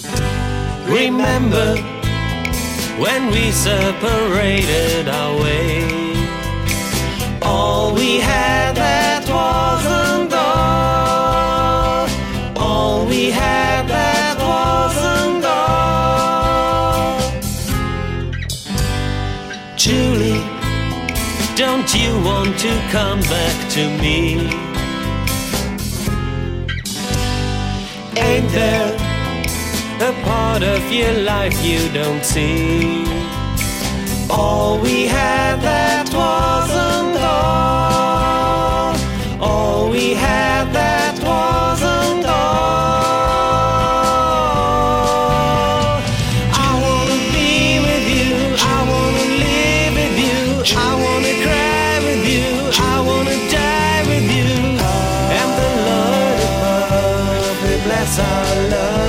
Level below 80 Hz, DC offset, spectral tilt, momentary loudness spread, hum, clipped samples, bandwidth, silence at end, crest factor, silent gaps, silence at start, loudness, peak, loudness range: -28 dBFS; under 0.1%; -4.5 dB/octave; 6 LU; none; under 0.1%; 16.5 kHz; 0 s; 14 dB; none; 0 s; -16 LUFS; -2 dBFS; 4 LU